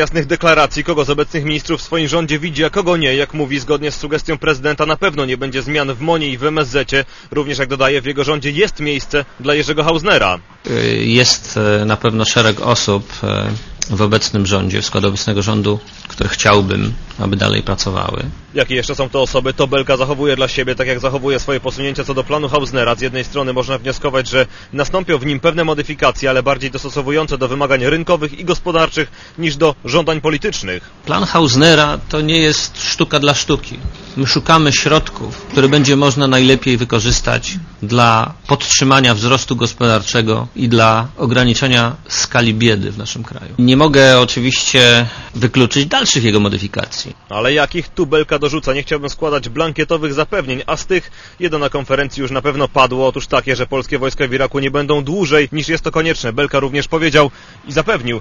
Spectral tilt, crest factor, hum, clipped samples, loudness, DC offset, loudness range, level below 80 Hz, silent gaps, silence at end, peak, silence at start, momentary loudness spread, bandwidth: -4 dB/octave; 14 dB; none; under 0.1%; -14 LUFS; under 0.1%; 5 LU; -32 dBFS; none; 0 s; 0 dBFS; 0 s; 9 LU; 11 kHz